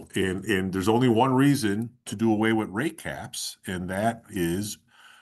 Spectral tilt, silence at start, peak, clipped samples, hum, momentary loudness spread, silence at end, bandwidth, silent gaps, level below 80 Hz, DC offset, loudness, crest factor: -5.5 dB/octave; 0 s; -8 dBFS; under 0.1%; none; 13 LU; 0.45 s; 13 kHz; none; -58 dBFS; under 0.1%; -26 LUFS; 16 dB